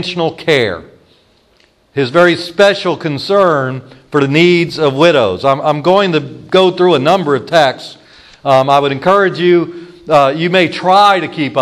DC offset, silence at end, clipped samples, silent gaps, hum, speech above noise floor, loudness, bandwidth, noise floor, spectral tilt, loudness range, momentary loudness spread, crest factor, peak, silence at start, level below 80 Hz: under 0.1%; 0 s; 0.2%; none; none; 41 dB; -11 LUFS; 12 kHz; -52 dBFS; -6 dB/octave; 3 LU; 9 LU; 12 dB; 0 dBFS; 0 s; -54 dBFS